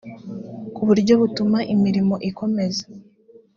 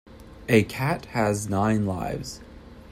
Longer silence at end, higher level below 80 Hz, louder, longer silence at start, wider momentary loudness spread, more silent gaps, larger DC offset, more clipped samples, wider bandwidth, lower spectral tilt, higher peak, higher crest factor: first, 0.55 s vs 0 s; second, -58 dBFS vs -48 dBFS; first, -20 LUFS vs -25 LUFS; about the same, 0.05 s vs 0.05 s; first, 18 LU vs 15 LU; neither; neither; neither; second, 7.2 kHz vs 16 kHz; about the same, -7 dB/octave vs -6 dB/octave; about the same, -4 dBFS vs -4 dBFS; about the same, 18 dB vs 20 dB